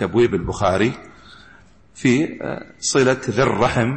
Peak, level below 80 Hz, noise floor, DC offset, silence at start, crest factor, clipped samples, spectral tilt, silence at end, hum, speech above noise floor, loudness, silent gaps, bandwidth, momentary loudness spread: -6 dBFS; -44 dBFS; -49 dBFS; under 0.1%; 0 s; 14 dB; under 0.1%; -5 dB/octave; 0 s; none; 31 dB; -19 LUFS; none; 8.8 kHz; 8 LU